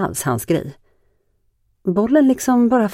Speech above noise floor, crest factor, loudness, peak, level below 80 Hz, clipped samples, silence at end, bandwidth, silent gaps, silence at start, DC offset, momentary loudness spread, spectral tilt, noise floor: 47 dB; 14 dB; -17 LUFS; -4 dBFS; -52 dBFS; under 0.1%; 0 s; 16.5 kHz; none; 0 s; under 0.1%; 9 LU; -6 dB/octave; -63 dBFS